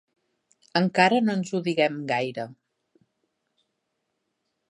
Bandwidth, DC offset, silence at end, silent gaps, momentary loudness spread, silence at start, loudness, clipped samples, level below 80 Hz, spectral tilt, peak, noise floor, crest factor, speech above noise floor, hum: 11 kHz; under 0.1%; 2.15 s; none; 12 LU; 0.75 s; -24 LUFS; under 0.1%; -76 dBFS; -5.5 dB/octave; -6 dBFS; -79 dBFS; 22 dB; 55 dB; none